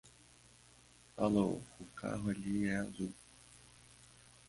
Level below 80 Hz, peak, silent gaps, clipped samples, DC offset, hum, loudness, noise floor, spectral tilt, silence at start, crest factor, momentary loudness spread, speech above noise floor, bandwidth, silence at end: -64 dBFS; -20 dBFS; none; under 0.1%; under 0.1%; none; -38 LUFS; -63 dBFS; -6.5 dB/octave; 0.05 s; 20 dB; 25 LU; 27 dB; 11.5 kHz; 0.55 s